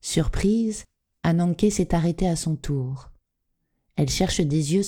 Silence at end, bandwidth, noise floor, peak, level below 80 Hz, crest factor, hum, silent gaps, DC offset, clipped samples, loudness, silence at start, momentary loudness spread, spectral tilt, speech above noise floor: 0 s; 16.5 kHz; -76 dBFS; -8 dBFS; -36 dBFS; 16 dB; none; none; under 0.1%; under 0.1%; -24 LUFS; 0.05 s; 8 LU; -5.5 dB/octave; 53 dB